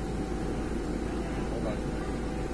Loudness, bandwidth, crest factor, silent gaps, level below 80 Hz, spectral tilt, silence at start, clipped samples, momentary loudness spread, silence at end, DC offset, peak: -33 LUFS; 11 kHz; 12 dB; none; -38 dBFS; -6.5 dB/octave; 0 s; under 0.1%; 1 LU; 0 s; 0.3%; -20 dBFS